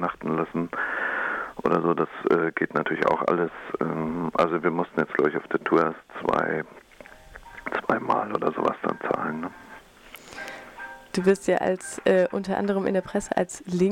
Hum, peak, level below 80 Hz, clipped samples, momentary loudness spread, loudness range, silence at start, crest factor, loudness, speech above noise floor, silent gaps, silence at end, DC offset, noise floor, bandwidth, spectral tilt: none; -10 dBFS; -58 dBFS; under 0.1%; 15 LU; 4 LU; 0 s; 16 dB; -25 LUFS; 23 dB; none; 0 s; under 0.1%; -48 dBFS; 16.5 kHz; -6 dB/octave